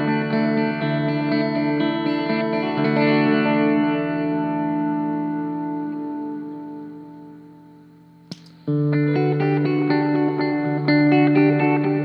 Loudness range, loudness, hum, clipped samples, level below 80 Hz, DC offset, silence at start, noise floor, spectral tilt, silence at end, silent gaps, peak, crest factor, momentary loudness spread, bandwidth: 10 LU; -20 LUFS; none; under 0.1%; -68 dBFS; under 0.1%; 0 s; -48 dBFS; -9.5 dB/octave; 0 s; none; -4 dBFS; 16 dB; 16 LU; 5.6 kHz